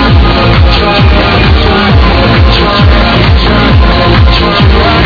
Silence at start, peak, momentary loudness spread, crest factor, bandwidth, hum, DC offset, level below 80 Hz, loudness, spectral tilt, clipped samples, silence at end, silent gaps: 0 s; 0 dBFS; 1 LU; 4 dB; 5.4 kHz; none; 0.6%; -10 dBFS; -6 LUFS; -7.5 dB/octave; 9%; 0 s; none